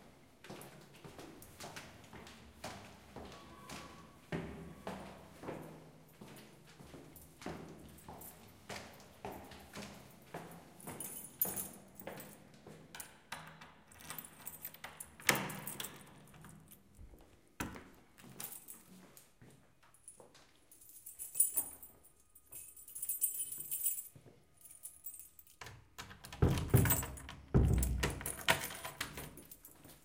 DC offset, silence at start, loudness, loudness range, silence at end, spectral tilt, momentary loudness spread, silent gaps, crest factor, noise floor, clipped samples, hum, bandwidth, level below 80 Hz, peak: under 0.1%; 0 s; -39 LUFS; 16 LU; 0.05 s; -4 dB/octave; 24 LU; none; 34 dB; -67 dBFS; under 0.1%; none; 17 kHz; -50 dBFS; -10 dBFS